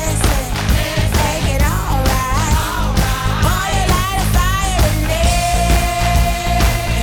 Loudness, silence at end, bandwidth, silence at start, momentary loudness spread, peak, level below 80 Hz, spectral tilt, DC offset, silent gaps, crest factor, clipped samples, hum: -16 LUFS; 0 s; 19.5 kHz; 0 s; 2 LU; -4 dBFS; -18 dBFS; -4.5 dB/octave; under 0.1%; none; 10 dB; under 0.1%; none